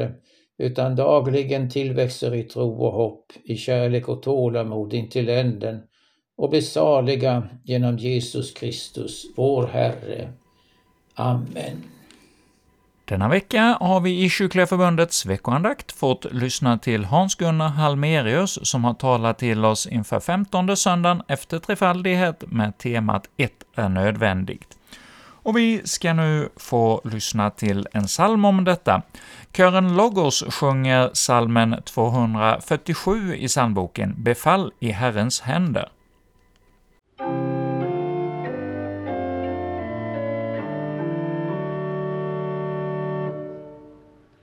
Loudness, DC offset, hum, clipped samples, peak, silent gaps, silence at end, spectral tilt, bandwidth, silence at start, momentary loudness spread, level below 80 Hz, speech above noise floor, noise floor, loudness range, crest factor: -22 LUFS; under 0.1%; none; under 0.1%; -2 dBFS; none; 0.5 s; -5 dB/octave; 16.5 kHz; 0 s; 11 LU; -54 dBFS; 40 dB; -61 dBFS; 8 LU; 20 dB